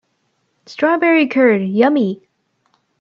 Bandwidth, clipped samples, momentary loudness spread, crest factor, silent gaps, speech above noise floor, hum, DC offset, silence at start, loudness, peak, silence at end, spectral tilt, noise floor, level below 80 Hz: 7.2 kHz; under 0.1%; 12 LU; 16 dB; none; 52 dB; none; under 0.1%; 0.7 s; -14 LUFS; 0 dBFS; 0.85 s; -7.5 dB/octave; -66 dBFS; -68 dBFS